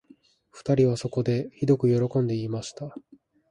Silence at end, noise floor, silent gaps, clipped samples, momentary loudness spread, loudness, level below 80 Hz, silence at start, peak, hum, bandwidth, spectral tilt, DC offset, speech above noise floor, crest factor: 0.5 s; -58 dBFS; none; under 0.1%; 14 LU; -25 LUFS; -60 dBFS; 0.55 s; -10 dBFS; none; 11 kHz; -7.5 dB/octave; under 0.1%; 33 dB; 16 dB